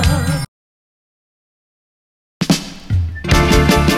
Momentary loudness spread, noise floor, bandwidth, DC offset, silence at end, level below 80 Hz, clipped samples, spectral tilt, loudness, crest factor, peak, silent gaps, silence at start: 11 LU; under -90 dBFS; 16.5 kHz; under 0.1%; 0 s; -24 dBFS; under 0.1%; -5 dB/octave; -16 LUFS; 16 dB; 0 dBFS; 0.48-2.40 s; 0 s